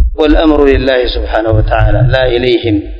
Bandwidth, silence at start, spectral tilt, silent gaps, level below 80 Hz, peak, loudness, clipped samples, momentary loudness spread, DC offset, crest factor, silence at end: 6.4 kHz; 0 s; -8.5 dB/octave; none; -16 dBFS; 0 dBFS; -10 LUFS; 1%; 4 LU; under 0.1%; 10 dB; 0 s